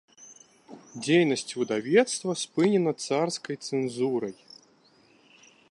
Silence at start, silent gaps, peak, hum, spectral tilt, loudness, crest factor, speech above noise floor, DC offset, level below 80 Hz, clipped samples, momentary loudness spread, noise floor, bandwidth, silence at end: 0.2 s; none; -8 dBFS; none; -4.5 dB/octave; -26 LUFS; 20 dB; 35 dB; under 0.1%; -78 dBFS; under 0.1%; 10 LU; -61 dBFS; 11.5 kHz; 1.4 s